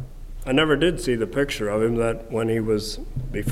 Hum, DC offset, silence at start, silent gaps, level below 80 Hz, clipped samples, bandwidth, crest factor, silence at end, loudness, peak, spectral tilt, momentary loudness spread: none; under 0.1%; 0 s; none; -36 dBFS; under 0.1%; 16 kHz; 18 dB; 0 s; -23 LUFS; -6 dBFS; -5.5 dB/octave; 11 LU